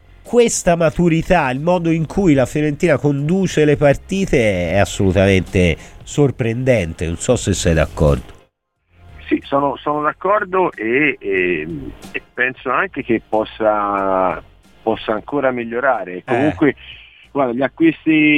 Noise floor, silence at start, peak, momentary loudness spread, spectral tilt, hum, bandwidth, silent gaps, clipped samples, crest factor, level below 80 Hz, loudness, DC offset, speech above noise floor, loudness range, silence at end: -62 dBFS; 0.25 s; -2 dBFS; 8 LU; -6 dB/octave; none; 15 kHz; none; under 0.1%; 16 dB; -34 dBFS; -17 LUFS; 0.2%; 46 dB; 4 LU; 0 s